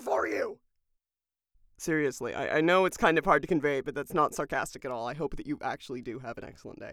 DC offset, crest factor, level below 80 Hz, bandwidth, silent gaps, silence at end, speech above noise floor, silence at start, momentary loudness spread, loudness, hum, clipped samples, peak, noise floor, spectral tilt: under 0.1%; 22 dB; -54 dBFS; 17 kHz; none; 0 s; over 60 dB; 0 s; 15 LU; -29 LUFS; none; under 0.1%; -10 dBFS; under -90 dBFS; -5 dB/octave